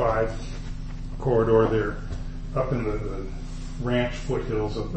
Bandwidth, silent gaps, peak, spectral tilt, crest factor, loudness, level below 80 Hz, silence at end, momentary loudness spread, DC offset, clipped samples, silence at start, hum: 8.6 kHz; none; -8 dBFS; -7.5 dB/octave; 18 dB; -26 LUFS; -34 dBFS; 0 s; 17 LU; under 0.1%; under 0.1%; 0 s; none